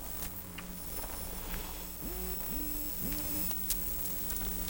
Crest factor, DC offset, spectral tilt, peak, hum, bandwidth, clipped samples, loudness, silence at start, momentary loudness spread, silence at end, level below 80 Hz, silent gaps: 18 dB; under 0.1%; -3 dB/octave; -18 dBFS; none; 17.5 kHz; under 0.1%; -35 LUFS; 0 s; 8 LU; 0 s; -44 dBFS; none